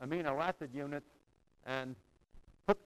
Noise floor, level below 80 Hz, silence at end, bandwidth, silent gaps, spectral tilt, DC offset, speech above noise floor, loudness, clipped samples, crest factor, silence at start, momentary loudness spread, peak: -60 dBFS; -64 dBFS; 0.05 s; 15 kHz; none; -6.5 dB/octave; under 0.1%; 21 dB; -40 LUFS; under 0.1%; 26 dB; 0 s; 13 LU; -14 dBFS